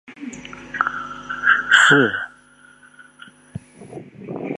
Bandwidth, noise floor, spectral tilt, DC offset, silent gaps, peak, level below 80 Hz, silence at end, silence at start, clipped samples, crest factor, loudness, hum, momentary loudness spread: 11 kHz; -50 dBFS; -3 dB/octave; under 0.1%; none; 0 dBFS; -58 dBFS; 0.05 s; 0.1 s; under 0.1%; 22 dB; -16 LUFS; 50 Hz at -55 dBFS; 26 LU